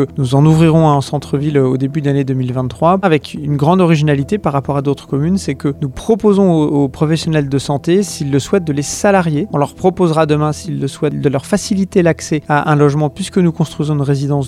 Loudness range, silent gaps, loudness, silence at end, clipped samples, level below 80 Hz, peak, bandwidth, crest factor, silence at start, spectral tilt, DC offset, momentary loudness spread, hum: 1 LU; none; -14 LUFS; 0 s; under 0.1%; -42 dBFS; 0 dBFS; 13.5 kHz; 14 dB; 0 s; -6.5 dB/octave; under 0.1%; 7 LU; none